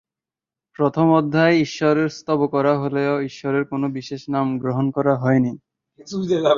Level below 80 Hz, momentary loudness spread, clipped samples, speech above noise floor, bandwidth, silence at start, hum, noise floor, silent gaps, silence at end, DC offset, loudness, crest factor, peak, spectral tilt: -62 dBFS; 9 LU; under 0.1%; 70 dB; 7.4 kHz; 0.8 s; none; -89 dBFS; none; 0 s; under 0.1%; -20 LUFS; 18 dB; -2 dBFS; -7 dB/octave